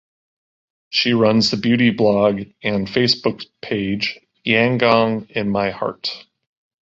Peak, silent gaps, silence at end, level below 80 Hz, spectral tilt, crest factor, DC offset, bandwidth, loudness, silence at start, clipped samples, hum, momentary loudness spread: -2 dBFS; none; 0.6 s; -52 dBFS; -5.5 dB/octave; 18 dB; under 0.1%; 7.8 kHz; -18 LUFS; 0.9 s; under 0.1%; none; 10 LU